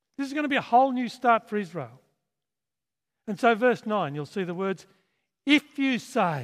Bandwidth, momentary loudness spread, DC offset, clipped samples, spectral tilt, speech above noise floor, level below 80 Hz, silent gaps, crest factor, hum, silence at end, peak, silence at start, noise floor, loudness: 14.5 kHz; 14 LU; under 0.1%; under 0.1%; -5.5 dB/octave; over 65 dB; -80 dBFS; none; 20 dB; none; 0 s; -6 dBFS; 0.2 s; under -90 dBFS; -25 LUFS